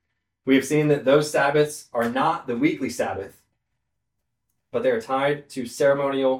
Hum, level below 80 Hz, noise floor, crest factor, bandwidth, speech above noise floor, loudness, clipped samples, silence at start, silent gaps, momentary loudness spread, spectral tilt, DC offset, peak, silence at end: none; -64 dBFS; -79 dBFS; 18 dB; 16.5 kHz; 58 dB; -22 LUFS; under 0.1%; 0.45 s; none; 11 LU; -5.5 dB/octave; under 0.1%; -4 dBFS; 0 s